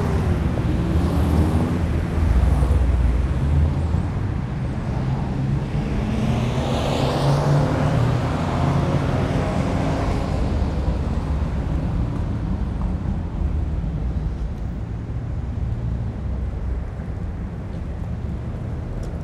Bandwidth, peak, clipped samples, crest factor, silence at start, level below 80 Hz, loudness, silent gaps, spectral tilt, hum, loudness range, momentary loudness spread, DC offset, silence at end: 12 kHz; -6 dBFS; under 0.1%; 14 dB; 0 s; -26 dBFS; -23 LUFS; none; -8 dB/octave; none; 7 LU; 9 LU; under 0.1%; 0 s